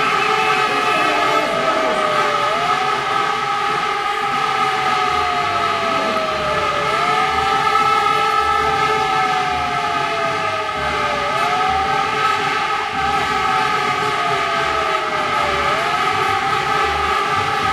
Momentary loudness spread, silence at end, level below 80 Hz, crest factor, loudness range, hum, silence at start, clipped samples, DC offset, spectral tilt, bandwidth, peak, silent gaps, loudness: 3 LU; 0 s; -46 dBFS; 16 dB; 2 LU; none; 0 s; under 0.1%; under 0.1%; -3 dB/octave; 16 kHz; -2 dBFS; none; -17 LUFS